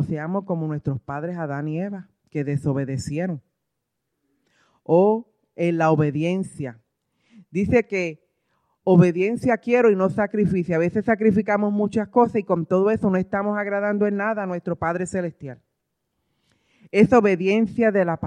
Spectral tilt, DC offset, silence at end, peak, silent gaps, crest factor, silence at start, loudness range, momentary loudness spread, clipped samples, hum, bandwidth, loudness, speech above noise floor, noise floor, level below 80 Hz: -8 dB/octave; under 0.1%; 0 s; -4 dBFS; none; 18 dB; 0 s; 7 LU; 12 LU; under 0.1%; none; 10.5 kHz; -22 LUFS; 59 dB; -79 dBFS; -54 dBFS